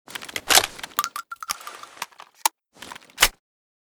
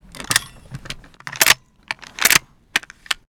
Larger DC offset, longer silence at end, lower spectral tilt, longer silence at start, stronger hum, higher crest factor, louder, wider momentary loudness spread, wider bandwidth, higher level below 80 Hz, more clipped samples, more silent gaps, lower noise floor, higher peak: neither; first, 0.65 s vs 0.15 s; about the same, 1 dB/octave vs 0 dB/octave; about the same, 0.1 s vs 0.15 s; neither; about the same, 26 dB vs 22 dB; second, -22 LUFS vs -17 LUFS; about the same, 22 LU vs 20 LU; about the same, over 20 kHz vs over 20 kHz; about the same, -48 dBFS vs -48 dBFS; neither; neither; first, -43 dBFS vs -37 dBFS; about the same, 0 dBFS vs 0 dBFS